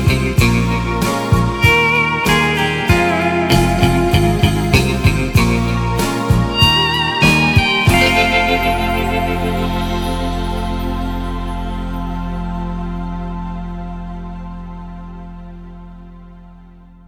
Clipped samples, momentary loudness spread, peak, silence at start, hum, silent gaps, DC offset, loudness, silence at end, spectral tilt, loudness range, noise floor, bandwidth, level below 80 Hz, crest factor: under 0.1%; 17 LU; 0 dBFS; 0 s; none; none; under 0.1%; -15 LUFS; 0.4 s; -5 dB/octave; 15 LU; -40 dBFS; 19 kHz; -24 dBFS; 16 dB